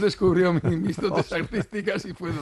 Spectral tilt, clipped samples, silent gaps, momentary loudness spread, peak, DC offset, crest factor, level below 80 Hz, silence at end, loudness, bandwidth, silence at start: -7 dB/octave; under 0.1%; none; 8 LU; -10 dBFS; under 0.1%; 14 dB; -48 dBFS; 0 s; -25 LUFS; 12 kHz; 0 s